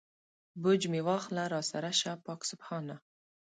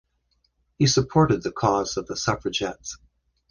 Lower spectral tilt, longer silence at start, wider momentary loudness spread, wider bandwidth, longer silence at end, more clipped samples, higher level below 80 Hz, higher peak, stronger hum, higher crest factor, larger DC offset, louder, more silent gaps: about the same, -4 dB/octave vs -5 dB/octave; second, 0.55 s vs 0.8 s; second, 12 LU vs 15 LU; about the same, 9.6 kHz vs 10.5 kHz; about the same, 0.6 s vs 0.55 s; neither; second, -80 dBFS vs -50 dBFS; second, -16 dBFS vs -6 dBFS; neither; about the same, 18 dB vs 20 dB; neither; second, -33 LUFS vs -23 LUFS; neither